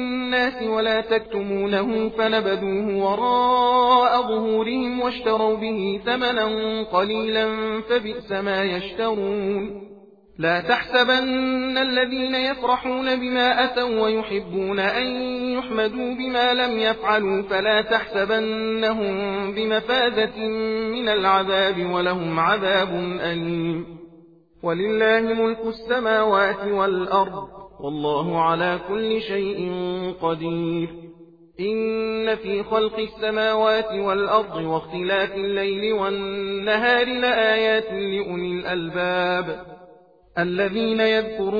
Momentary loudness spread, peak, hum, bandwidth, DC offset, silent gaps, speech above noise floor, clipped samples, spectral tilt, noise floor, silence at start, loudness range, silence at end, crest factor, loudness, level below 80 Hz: 8 LU; -4 dBFS; none; 5 kHz; under 0.1%; none; 29 dB; under 0.1%; -6.5 dB/octave; -51 dBFS; 0 s; 4 LU; 0 s; 18 dB; -22 LUFS; -54 dBFS